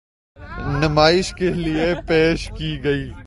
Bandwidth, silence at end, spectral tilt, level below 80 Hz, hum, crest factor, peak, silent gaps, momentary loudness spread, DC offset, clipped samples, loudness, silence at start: 11.5 kHz; 0.05 s; -5.5 dB/octave; -34 dBFS; none; 20 dB; 0 dBFS; none; 11 LU; under 0.1%; under 0.1%; -19 LUFS; 0.4 s